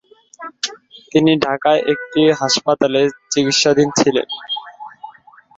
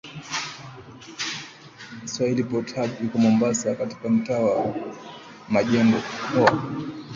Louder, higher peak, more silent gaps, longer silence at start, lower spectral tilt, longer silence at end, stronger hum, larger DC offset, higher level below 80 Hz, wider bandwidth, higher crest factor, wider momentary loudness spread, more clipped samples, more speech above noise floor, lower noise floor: first, -16 LUFS vs -24 LUFS; about the same, -2 dBFS vs -2 dBFS; neither; first, 0.4 s vs 0.05 s; second, -3.5 dB/octave vs -5 dB/octave; first, 0.5 s vs 0 s; neither; neither; about the same, -58 dBFS vs -60 dBFS; about the same, 8.2 kHz vs 7.6 kHz; second, 16 dB vs 22 dB; second, 15 LU vs 21 LU; neither; first, 29 dB vs 21 dB; about the same, -44 dBFS vs -43 dBFS